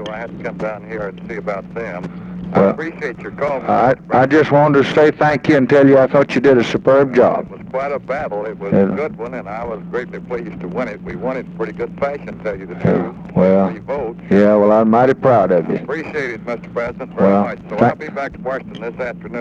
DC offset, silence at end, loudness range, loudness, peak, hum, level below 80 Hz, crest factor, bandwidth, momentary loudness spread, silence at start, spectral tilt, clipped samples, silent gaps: under 0.1%; 0 s; 9 LU; -16 LUFS; 0 dBFS; none; -48 dBFS; 16 dB; 8 kHz; 14 LU; 0 s; -8 dB/octave; under 0.1%; none